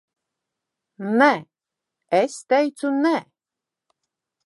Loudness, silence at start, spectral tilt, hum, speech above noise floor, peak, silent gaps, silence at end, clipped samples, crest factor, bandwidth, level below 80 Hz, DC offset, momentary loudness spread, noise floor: -21 LUFS; 1 s; -5 dB/octave; none; 68 dB; -2 dBFS; none; 1.25 s; under 0.1%; 22 dB; 11.5 kHz; -82 dBFS; under 0.1%; 9 LU; -87 dBFS